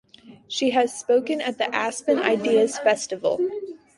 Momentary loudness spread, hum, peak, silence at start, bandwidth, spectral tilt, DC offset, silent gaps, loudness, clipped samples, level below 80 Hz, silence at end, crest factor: 7 LU; none; -4 dBFS; 0.25 s; 11.5 kHz; -3 dB/octave; under 0.1%; none; -23 LUFS; under 0.1%; -70 dBFS; 0.2 s; 18 dB